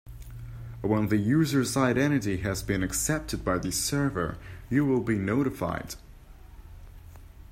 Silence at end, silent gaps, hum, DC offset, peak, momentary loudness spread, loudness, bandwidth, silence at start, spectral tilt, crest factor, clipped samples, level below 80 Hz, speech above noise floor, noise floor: 0 s; none; none; under 0.1%; -10 dBFS; 18 LU; -27 LUFS; 16 kHz; 0.05 s; -5 dB/octave; 18 dB; under 0.1%; -46 dBFS; 21 dB; -48 dBFS